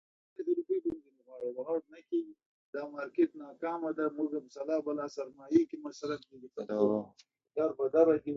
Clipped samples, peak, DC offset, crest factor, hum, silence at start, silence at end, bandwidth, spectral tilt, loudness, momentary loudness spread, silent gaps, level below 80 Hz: under 0.1%; -12 dBFS; under 0.1%; 20 dB; none; 0.4 s; 0 s; 7.4 kHz; -7 dB/octave; -34 LUFS; 13 LU; 2.46-2.73 s; -76 dBFS